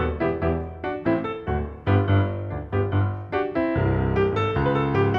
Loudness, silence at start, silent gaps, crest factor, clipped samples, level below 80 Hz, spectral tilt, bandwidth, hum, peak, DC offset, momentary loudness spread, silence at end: -24 LUFS; 0 s; none; 14 dB; under 0.1%; -38 dBFS; -9.5 dB/octave; 5.2 kHz; none; -8 dBFS; under 0.1%; 6 LU; 0 s